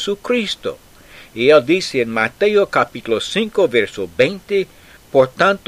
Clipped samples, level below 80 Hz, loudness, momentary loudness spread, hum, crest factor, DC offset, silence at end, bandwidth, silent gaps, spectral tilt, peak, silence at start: under 0.1%; -52 dBFS; -17 LUFS; 10 LU; none; 16 dB; under 0.1%; 0.1 s; 15.5 kHz; none; -4.5 dB/octave; 0 dBFS; 0 s